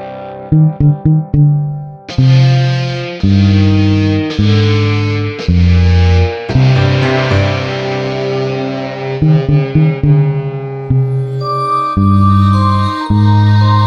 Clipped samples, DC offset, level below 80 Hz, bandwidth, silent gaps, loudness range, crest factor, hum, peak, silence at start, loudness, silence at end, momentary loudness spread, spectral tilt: under 0.1%; under 0.1%; -28 dBFS; 7 kHz; none; 2 LU; 10 dB; none; 0 dBFS; 0 s; -12 LUFS; 0 s; 8 LU; -8 dB/octave